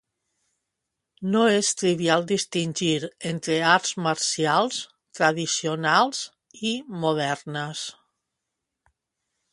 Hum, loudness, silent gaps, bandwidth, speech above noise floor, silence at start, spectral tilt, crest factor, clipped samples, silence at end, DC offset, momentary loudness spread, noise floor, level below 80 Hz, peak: none; -24 LUFS; none; 11.5 kHz; 59 dB; 1.2 s; -3.5 dB/octave; 22 dB; under 0.1%; 1.6 s; under 0.1%; 12 LU; -83 dBFS; -70 dBFS; -4 dBFS